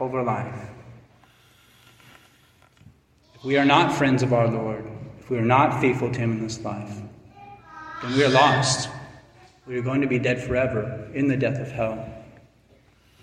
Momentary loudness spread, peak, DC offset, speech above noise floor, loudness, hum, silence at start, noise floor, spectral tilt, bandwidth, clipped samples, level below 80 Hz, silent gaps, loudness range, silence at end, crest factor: 20 LU; -2 dBFS; under 0.1%; 35 dB; -23 LUFS; none; 0 s; -57 dBFS; -5.5 dB/octave; 11.5 kHz; under 0.1%; -54 dBFS; none; 5 LU; 1 s; 22 dB